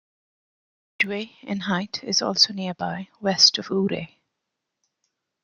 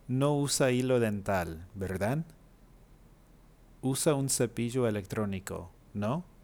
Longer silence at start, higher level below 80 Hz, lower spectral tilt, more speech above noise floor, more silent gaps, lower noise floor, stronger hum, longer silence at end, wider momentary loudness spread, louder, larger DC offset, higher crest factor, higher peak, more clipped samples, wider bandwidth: first, 1 s vs 0.05 s; second, -68 dBFS vs -56 dBFS; second, -3 dB/octave vs -5 dB/octave; first, 58 dB vs 28 dB; neither; first, -82 dBFS vs -58 dBFS; neither; first, 1.4 s vs 0.2 s; first, 15 LU vs 12 LU; first, -22 LUFS vs -31 LUFS; neither; first, 24 dB vs 18 dB; first, -4 dBFS vs -14 dBFS; neither; second, 12 kHz vs over 20 kHz